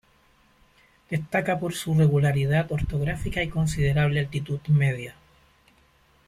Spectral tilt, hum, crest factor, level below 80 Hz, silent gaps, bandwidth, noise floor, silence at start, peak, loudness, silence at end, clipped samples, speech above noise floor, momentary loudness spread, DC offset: -6.5 dB/octave; none; 16 dB; -42 dBFS; none; 14 kHz; -61 dBFS; 1.1 s; -10 dBFS; -25 LUFS; 1.15 s; under 0.1%; 37 dB; 9 LU; under 0.1%